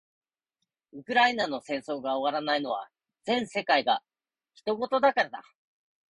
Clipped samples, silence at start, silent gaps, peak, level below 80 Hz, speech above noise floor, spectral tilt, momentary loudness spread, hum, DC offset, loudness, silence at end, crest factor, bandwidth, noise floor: under 0.1%; 0.95 s; none; -10 dBFS; -74 dBFS; 57 dB; -4 dB/octave; 12 LU; none; under 0.1%; -28 LUFS; 0.7 s; 20 dB; 11.5 kHz; -85 dBFS